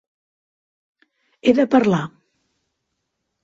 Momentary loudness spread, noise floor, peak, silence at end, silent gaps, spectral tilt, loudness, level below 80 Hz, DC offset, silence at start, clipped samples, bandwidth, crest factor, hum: 9 LU; -76 dBFS; -2 dBFS; 1.35 s; none; -7 dB/octave; -18 LUFS; -62 dBFS; under 0.1%; 1.45 s; under 0.1%; 7.6 kHz; 20 dB; none